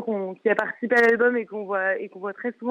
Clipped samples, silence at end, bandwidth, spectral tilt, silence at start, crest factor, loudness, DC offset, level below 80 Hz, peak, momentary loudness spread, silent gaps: under 0.1%; 0 s; 8.6 kHz; -6 dB/octave; 0 s; 16 dB; -23 LUFS; under 0.1%; -72 dBFS; -8 dBFS; 12 LU; none